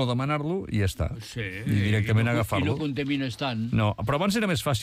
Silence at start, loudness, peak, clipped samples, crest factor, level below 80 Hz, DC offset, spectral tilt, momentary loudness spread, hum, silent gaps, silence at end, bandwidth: 0 s; -26 LUFS; -14 dBFS; under 0.1%; 12 dB; -44 dBFS; under 0.1%; -6 dB/octave; 7 LU; none; none; 0 s; 15.5 kHz